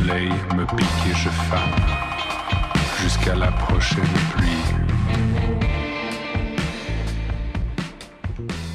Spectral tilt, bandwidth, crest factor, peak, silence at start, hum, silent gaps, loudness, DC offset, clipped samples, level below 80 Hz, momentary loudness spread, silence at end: -5.5 dB/octave; 13.5 kHz; 12 dB; -10 dBFS; 0 s; none; none; -22 LUFS; under 0.1%; under 0.1%; -28 dBFS; 7 LU; 0 s